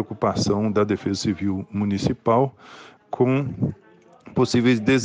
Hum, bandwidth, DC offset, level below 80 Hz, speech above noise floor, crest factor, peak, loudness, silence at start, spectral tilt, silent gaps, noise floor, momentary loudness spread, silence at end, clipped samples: none; 9.6 kHz; under 0.1%; -52 dBFS; 26 dB; 16 dB; -6 dBFS; -22 LUFS; 0 s; -6 dB/octave; none; -48 dBFS; 8 LU; 0 s; under 0.1%